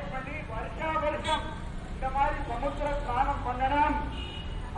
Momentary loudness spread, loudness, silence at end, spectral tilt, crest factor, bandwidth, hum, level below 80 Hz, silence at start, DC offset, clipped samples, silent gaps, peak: 10 LU; -31 LUFS; 0 s; -5.5 dB/octave; 16 dB; 11 kHz; none; -38 dBFS; 0 s; under 0.1%; under 0.1%; none; -14 dBFS